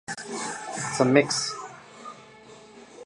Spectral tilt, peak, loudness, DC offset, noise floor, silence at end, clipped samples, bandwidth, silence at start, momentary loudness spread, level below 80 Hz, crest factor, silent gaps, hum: -4 dB/octave; -4 dBFS; -25 LUFS; under 0.1%; -49 dBFS; 0 s; under 0.1%; 11.5 kHz; 0.1 s; 25 LU; -70 dBFS; 24 dB; none; none